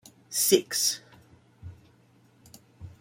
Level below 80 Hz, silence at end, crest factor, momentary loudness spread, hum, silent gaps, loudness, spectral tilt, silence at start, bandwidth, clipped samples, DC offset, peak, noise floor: -66 dBFS; 0.1 s; 26 dB; 26 LU; none; none; -25 LUFS; -2 dB/octave; 0.3 s; 16.5 kHz; under 0.1%; under 0.1%; -6 dBFS; -60 dBFS